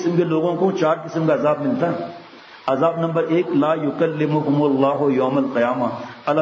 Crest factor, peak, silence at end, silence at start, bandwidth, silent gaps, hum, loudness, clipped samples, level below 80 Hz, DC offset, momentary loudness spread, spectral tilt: 14 dB; -4 dBFS; 0 s; 0 s; 7.4 kHz; none; none; -20 LUFS; under 0.1%; -68 dBFS; under 0.1%; 6 LU; -8 dB/octave